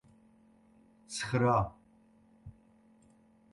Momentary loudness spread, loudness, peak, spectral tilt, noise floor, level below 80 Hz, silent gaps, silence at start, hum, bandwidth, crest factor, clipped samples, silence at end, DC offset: 27 LU; -32 LUFS; -16 dBFS; -5.5 dB/octave; -64 dBFS; -58 dBFS; none; 1.1 s; none; 11.5 kHz; 20 dB; under 0.1%; 1 s; under 0.1%